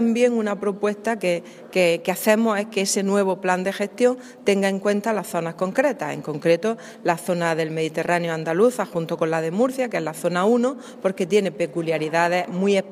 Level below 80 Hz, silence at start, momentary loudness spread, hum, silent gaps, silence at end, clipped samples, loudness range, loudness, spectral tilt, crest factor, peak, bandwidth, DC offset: -74 dBFS; 0 s; 6 LU; none; none; 0 s; under 0.1%; 2 LU; -22 LUFS; -5 dB/octave; 18 dB; -4 dBFS; 16 kHz; under 0.1%